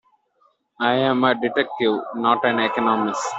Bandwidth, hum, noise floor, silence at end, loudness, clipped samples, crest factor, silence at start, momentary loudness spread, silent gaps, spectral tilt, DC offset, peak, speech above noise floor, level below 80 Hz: 8.2 kHz; none; -63 dBFS; 0 s; -20 LUFS; under 0.1%; 18 dB; 0.8 s; 4 LU; none; -4.5 dB/octave; under 0.1%; -4 dBFS; 43 dB; -66 dBFS